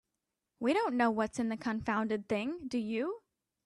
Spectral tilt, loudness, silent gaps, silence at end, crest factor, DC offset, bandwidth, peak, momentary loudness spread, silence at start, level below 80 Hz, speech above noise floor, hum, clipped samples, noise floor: -5.5 dB/octave; -34 LUFS; none; 0.45 s; 18 dB; under 0.1%; 11 kHz; -16 dBFS; 6 LU; 0.6 s; -68 dBFS; 54 dB; none; under 0.1%; -87 dBFS